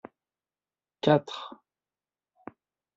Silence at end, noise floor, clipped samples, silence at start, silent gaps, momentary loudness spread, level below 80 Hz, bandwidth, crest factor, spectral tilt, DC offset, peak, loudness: 1.4 s; under -90 dBFS; under 0.1%; 1.05 s; none; 25 LU; -72 dBFS; 7.8 kHz; 24 dB; -5 dB/octave; under 0.1%; -8 dBFS; -27 LUFS